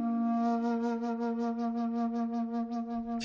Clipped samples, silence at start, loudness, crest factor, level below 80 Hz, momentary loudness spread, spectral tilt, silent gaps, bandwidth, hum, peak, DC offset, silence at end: under 0.1%; 0 s; -32 LUFS; 10 dB; -68 dBFS; 5 LU; -7 dB/octave; none; 6.8 kHz; none; -22 dBFS; under 0.1%; 0 s